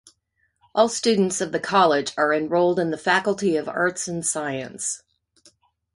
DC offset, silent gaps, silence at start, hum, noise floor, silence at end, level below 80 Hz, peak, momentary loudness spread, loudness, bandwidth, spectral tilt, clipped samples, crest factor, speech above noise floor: under 0.1%; none; 0.75 s; none; -70 dBFS; 1 s; -64 dBFS; -2 dBFS; 9 LU; -22 LUFS; 11.5 kHz; -3.5 dB/octave; under 0.1%; 20 dB; 49 dB